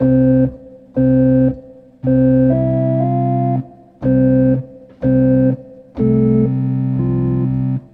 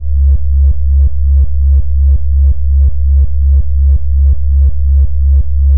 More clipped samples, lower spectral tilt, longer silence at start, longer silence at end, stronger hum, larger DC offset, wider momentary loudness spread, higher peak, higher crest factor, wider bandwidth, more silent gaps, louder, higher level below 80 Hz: neither; about the same, -13.5 dB/octave vs -13.5 dB/octave; about the same, 0 s vs 0 s; first, 0.15 s vs 0 s; neither; second, under 0.1% vs 20%; first, 10 LU vs 1 LU; about the same, -4 dBFS vs -2 dBFS; about the same, 12 dB vs 8 dB; first, 2.8 kHz vs 0.7 kHz; neither; second, -15 LUFS vs -12 LUFS; second, -38 dBFS vs -10 dBFS